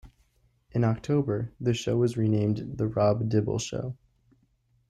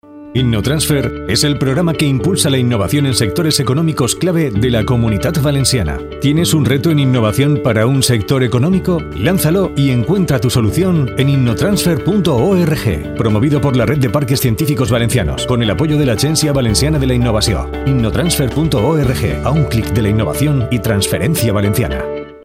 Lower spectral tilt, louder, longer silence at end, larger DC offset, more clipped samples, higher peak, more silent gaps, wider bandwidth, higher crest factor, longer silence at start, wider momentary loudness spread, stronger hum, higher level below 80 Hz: first, -7 dB/octave vs -5.5 dB/octave; second, -27 LUFS vs -14 LUFS; first, 0.95 s vs 0.05 s; neither; neither; second, -12 dBFS vs 0 dBFS; neither; second, 9.8 kHz vs 16 kHz; about the same, 16 dB vs 14 dB; about the same, 0.05 s vs 0.1 s; first, 9 LU vs 3 LU; neither; second, -56 dBFS vs -30 dBFS